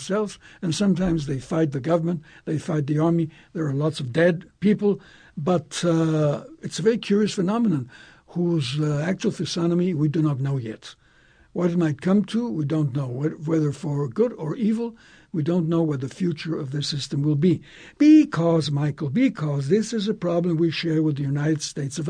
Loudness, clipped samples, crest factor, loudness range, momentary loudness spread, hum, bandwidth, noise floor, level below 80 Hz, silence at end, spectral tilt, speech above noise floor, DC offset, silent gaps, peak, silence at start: -23 LUFS; under 0.1%; 16 dB; 4 LU; 8 LU; none; 10.5 kHz; -56 dBFS; -56 dBFS; 0 s; -6.5 dB/octave; 33 dB; under 0.1%; none; -6 dBFS; 0 s